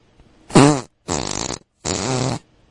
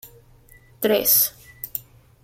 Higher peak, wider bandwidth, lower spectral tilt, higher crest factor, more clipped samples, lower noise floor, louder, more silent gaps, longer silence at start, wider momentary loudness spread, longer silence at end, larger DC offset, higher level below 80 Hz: first, 0 dBFS vs -4 dBFS; second, 11.5 kHz vs 16.5 kHz; first, -4.5 dB/octave vs -2 dB/octave; about the same, 20 dB vs 22 dB; neither; about the same, -51 dBFS vs -51 dBFS; about the same, -19 LUFS vs -20 LUFS; neither; first, 0.5 s vs 0.05 s; second, 14 LU vs 17 LU; second, 0.3 s vs 0.45 s; neither; first, -44 dBFS vs -56 dBFS